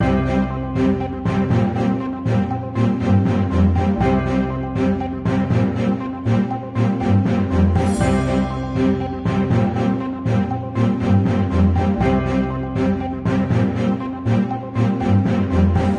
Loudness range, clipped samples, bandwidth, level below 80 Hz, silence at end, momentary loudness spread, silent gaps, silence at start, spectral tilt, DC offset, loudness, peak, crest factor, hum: 1 LU; under 0.1%; 11 kHz; -34 dBFS; 0 s; 5 LU; none; 0 s; -8.5 dB/octave; under 0.1%; -19 LUFS; -4 dBFS; 14 dB; none